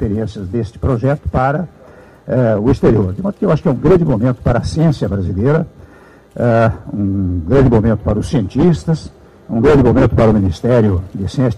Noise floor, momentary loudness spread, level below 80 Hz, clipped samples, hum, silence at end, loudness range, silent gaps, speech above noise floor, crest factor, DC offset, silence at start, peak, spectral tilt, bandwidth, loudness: -42 dBFS; 10 LU; -30 dBFS; under 0.1%; none; 0 s; 3 LU; none; 29 dB; 12 dB; under 0.1%; 0 s; -2 dBFS; -8.5 dB/octave; 11 kHz; -14 LUFS